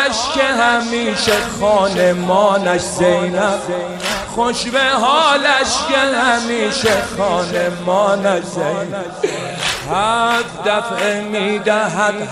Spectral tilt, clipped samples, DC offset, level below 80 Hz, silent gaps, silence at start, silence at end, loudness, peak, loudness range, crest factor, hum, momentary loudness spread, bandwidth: -3.5 dB/octave; under 0.1%; under 0.1%; -46 dBFS; none; 0 s; 0 s; -15 LUFS; 0 dBFS; 3 LU; 16 dB; none; 7 LU; 15.5 kHz